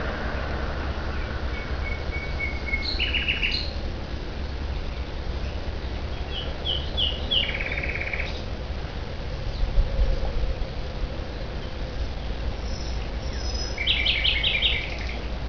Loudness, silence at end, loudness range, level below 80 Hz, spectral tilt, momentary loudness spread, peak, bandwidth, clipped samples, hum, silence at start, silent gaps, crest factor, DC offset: -27 LUFS; 0 s; 7 LU; -30 dBFS; -4.5 dB/octave; 11 LU; -8 dBFS; 5.4 kHz; under 0.1%; none; 0 s; none; 18 dB; 0.9%